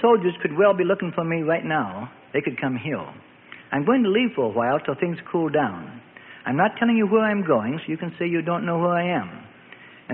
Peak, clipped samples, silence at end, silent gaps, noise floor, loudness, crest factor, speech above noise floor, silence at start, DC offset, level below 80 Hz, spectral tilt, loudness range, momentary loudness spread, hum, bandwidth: -6 dBFS; under 0.1%; 0 s; none; -46 dBFS; -23 LUFS; 16 dB; 24 dB; 0 s; under 0.1%; -66 dBFS; -11.5 dB/octave; 2 LU; 15 LU; none; 4 kHz